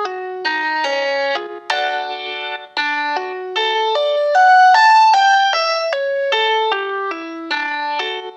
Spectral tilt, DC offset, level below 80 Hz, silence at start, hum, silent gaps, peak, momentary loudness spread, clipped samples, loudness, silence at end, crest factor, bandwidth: 0.5 dB/octave; under 0.1%; -88 dBFS; 0 s; none; none; 0 dBFS; 14 LU; under 0.1%; -16 LUFS; 0 s; 16 dB; 8.6 kHz